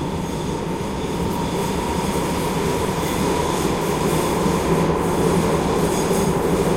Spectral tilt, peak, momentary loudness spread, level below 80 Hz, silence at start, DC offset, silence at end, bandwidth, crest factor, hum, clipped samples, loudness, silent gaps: -5.5 dB/octave; -4 dBFS; 6 LU; -34 dBFS; 0 s; under 0.1%; 0 s; 16 kHz; 16 dB; none; under 0.1%; -21 LUFS; none